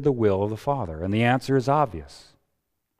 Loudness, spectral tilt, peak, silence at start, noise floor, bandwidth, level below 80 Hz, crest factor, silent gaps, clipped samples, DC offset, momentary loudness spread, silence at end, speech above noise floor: -24 LUFS; -7.5 dB/octave; -6 dBFS; 0 s; -77 dBFS; 15 kHz; -50 dBFS; 18 dB; none; under 0.1%; under 0.1%; 7 LU; 0.8 s; 53 dB